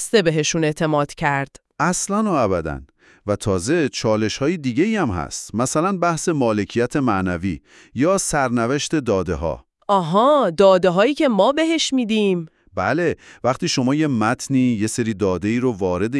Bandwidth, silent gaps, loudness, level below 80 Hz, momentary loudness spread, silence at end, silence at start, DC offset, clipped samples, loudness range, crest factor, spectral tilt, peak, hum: 12 kHz; none; -19 LUFS; -46 dBFS; 9 LU; 0 s; 0 s; under 0.1%; under 0.1%; 4 LU; 18 dB; -5 dB/octave; -2 dBFS; none